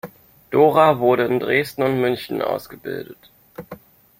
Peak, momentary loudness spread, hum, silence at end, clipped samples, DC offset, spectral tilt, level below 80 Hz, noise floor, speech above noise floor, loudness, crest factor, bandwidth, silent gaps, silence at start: -2 dBFS; 24 LU; none; 0.45 s; under 0.1%; under 0.1%; -6.5 dB/octave; -58 dBFS; -42 dBFS; 23 dB; -18 LUFS; 18 dB; 16.5 kHz; none; 0.05 s